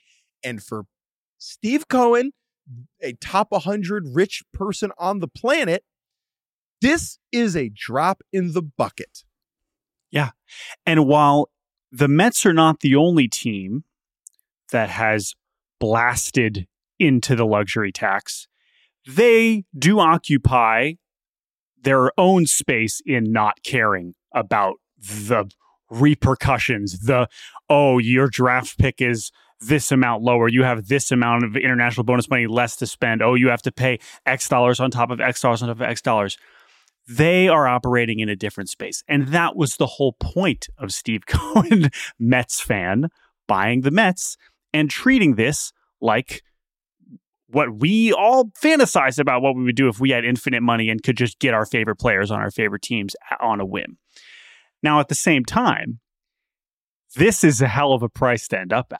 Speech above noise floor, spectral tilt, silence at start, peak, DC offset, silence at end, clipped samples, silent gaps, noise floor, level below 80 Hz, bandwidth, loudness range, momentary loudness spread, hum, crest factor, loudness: over 71 dB; -5 dB/octave; 0.45 s; -4 dBFS; under 0.1%; 0 s; under 0.1%; 1.13-1.36 s, 6.49-6.76 s, 21.29-21.33 s, 21.46-21.50 s, 21.59-21.73 s, 47.28-47.33 s, 56.73-57.03 s; under -90 dBFS; -46 dBFS; 16 kHz; 5 LU; 12 LU; none; 16 dB; -19 LUFS